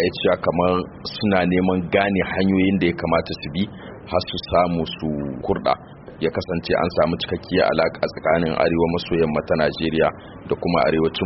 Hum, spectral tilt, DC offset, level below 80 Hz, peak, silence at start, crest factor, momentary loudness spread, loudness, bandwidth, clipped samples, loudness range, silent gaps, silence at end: none; -4.5 dB/octave; under 0.1%; -44 dBFS; -2 dBFS; 0 s; 18 dB; 8 LU; -21 LUFS; 6 kHz; under 0.1%; 3 LU; none; 0 s